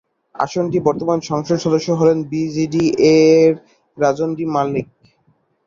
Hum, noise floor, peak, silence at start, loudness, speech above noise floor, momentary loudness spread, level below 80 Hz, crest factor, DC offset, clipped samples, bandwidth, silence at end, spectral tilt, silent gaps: none; -61 dBFS; -2 dBFS; 0.4 s; -17 LUFS; 45 dB; 10 LU; -56 dBFS; 14 dB; under 0.1%; under 0.1%; 7.4 kHz; 0.85 s; -6.5 dB/octave; none